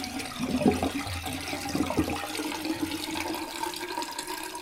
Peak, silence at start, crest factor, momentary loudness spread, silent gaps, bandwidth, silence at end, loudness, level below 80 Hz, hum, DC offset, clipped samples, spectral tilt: -8 dBFS; 0 s; 24 dB; 7 LU; none; 16 kHz; 0 s; -31 LUFS; -50 dBFS; none; under 0.1%; under 0.1%; -4 dB/octave